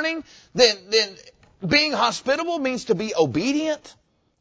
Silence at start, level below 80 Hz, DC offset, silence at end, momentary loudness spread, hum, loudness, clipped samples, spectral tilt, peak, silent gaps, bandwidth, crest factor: 0 s; -56 dBFS; under 0.1%; 0.5 s; 12 LU; none; -21 LUFS; under 0.1%; -3.5 dB/octave; -2 dBFS; none; 8 kHz; 20 dB